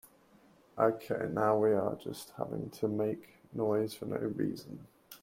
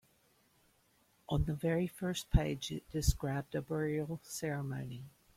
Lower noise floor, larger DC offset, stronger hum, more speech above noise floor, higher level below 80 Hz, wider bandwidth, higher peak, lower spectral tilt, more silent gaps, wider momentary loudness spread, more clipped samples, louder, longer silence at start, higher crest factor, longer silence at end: second, -63 dBFS vs -72 dBFS; neither; neither; second, 30 dB vs 36 dB; second, -70 dBFS vs -44 dBFS; about the same, 16.5 kHz vs 16.5 kHz; about the same, -14 dBFS vs -14 dBFS; first, -7 dB/octave vs -5.5 dB/octave; neither; first, 17 LU vs 8 LU; neither; first, -34 LUFS vs -37 LUFS; second, 0.75 s vs 1.3 s; about the same, 22 dB vs 22 dB; second, 0.05 s vs 0.25 s